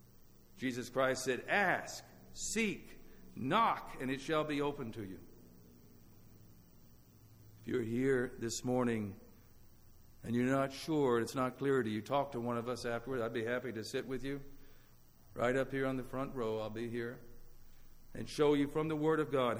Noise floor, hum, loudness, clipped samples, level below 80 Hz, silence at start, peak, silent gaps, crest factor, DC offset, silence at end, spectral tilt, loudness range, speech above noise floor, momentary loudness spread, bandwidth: -61 dBFS; none; -36 LUFS; under 0.1%; -58 dBFS; 0.55 s; -18 dBFS; none; 18 dB; under 0.1%; 0 s; -5 dB/octave; 6 LU; 25 dB; 15 LU; over 20 kHz